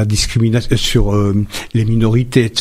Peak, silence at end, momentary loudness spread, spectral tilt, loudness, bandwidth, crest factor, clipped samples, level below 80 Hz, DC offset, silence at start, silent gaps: 0 dBFS; 0 s; 4 LU; -5.5 dB/octave; -15 LUFS; 15 kHz; 14 dB; under 0.1%; -24 dBFS; under 0.1%; 0 s; none